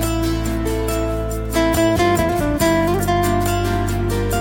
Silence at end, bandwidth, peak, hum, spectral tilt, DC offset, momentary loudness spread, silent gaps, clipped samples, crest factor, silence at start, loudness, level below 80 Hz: 0 s; 18 kHz; -4 dBFS; none; -5.5 dB/octave; under 0.1%; 5 LU; none; under 0.1%; 14 dB; 0 s; -19 LUFS; -26 dBFS